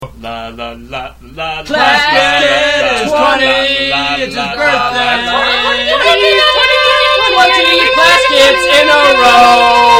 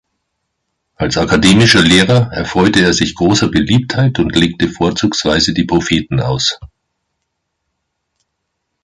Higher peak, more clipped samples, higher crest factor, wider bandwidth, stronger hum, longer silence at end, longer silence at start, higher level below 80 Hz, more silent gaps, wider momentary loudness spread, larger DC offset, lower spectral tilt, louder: about the same, 0 dBFS vs 0 dBFS; first, 0.8% vs under 0.1%; about the same, 10 dB vs 14 dB; first, 17 kHz vs 11.5 kHz; neither; second, 0 s vs 2.2 s; second, 0 s vs 1 s; about the same, -36 dBFS vs -34 dBFS; neither; first, 17 LU vs 8 LU; neither; second, -2 dB/octave vs -4.5 dB/octave; first, -8 LUFS vs -12 LUFS